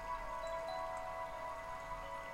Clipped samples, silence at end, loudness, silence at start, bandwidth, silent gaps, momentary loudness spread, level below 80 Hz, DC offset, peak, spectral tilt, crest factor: under 0.1%; 0 s; -44 LUFS; 0 s; 17 kHz; none; 4 LU; -58 dBFS; under 0.1%; -32 dBFS; -3.5 dB/octave; 12 dB